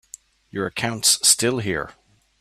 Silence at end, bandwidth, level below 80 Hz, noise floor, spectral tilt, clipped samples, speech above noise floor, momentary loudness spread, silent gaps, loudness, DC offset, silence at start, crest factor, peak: 0.5 s; 15.5 kHz; -56 dBFS; -47 dBFS; -2 dB/octave; under 0.1%; 26 dB; 16 LU; none; -19 LUFS; under 0.1%; 0.55 s; 22 dB; -2 dBFS